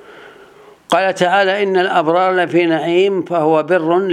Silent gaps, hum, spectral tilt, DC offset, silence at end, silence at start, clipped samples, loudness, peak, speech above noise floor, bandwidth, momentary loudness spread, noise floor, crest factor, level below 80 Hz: none; none; -5.5 dB/octave; under 0.1%; 0 s; 0.1 s; under 0.1%; -14 LUFS; 0 dBFS; 29 dB; 11.5 kHz; 2 LU; -43 dBFS; 14 dB; -68 dBFS